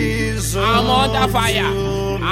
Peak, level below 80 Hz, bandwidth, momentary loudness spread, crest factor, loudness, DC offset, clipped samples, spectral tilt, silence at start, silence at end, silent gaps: -4 dBFS; -28 dBFS; 17 kHz; 6 LU; 14 dB; -17 LUFS; under 0.1%; under 0.1%; -4.5 dB/octave; 0 s; 0 s; none